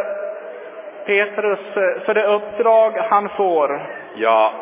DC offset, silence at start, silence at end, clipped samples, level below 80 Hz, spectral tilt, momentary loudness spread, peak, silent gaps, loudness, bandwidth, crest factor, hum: under 0.1%; 0 s; 0 s; under 0.1%; -70 dBFS; -7.5 dB/octave; 16 LU; -2 dBFS; none; -18 LUFS; 3.8 kHz; 16 dB; none